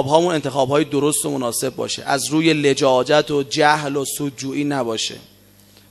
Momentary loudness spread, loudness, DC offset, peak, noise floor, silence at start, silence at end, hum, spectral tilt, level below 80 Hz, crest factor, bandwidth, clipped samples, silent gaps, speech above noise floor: 8 LU; -19 LUFS; under 0.1%; 0 dBFS; -49 dBFS; 0 s; 0.7 s; none; -4 dB/octave; -60 dBFS; 18 dB; 14.5 kHz; under 0.1%; none; 31 dB